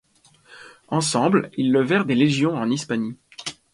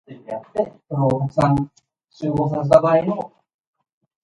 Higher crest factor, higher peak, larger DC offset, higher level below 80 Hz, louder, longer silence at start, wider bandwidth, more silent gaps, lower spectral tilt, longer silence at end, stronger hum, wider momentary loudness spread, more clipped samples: about the same, 18 dB vs 20 dB; second, -6 dBFS vs 0 dBFS; neither; second, -62 dBFS vs -50 dBFS; about the same, -21 LUFS vs -20 LUFS; first, 0.5 s vs 0.1 s; about the same, 11.5 kHz vs 11 kHz; neither; second, -5 dB/octave vs -9 dB/octave; second, 0.2 s vs 0.95 s; neither; second, 14 LU vs 17 LU; neither